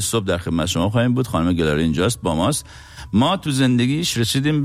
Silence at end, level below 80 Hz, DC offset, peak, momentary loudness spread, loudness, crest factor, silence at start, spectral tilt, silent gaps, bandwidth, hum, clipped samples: 0 s; -40 dBFS; under 0.1%; -8 dBFS; 4 LU; -19 LUFS; 12 dB; 0 s; -5 dB/octave; none; 16 kHz; none; under 0.1%